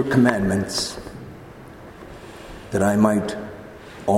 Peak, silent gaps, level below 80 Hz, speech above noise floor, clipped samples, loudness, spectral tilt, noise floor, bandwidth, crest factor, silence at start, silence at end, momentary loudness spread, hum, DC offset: 0 dBFS; none; -48 dBFS; 21 dB; under 0.1%; -21 LUFS; -5.5 dB/octave; -41 dBFS; 16 kHz; 22 dB; 0 s; 0 s; 23 LU; none; under 0.1%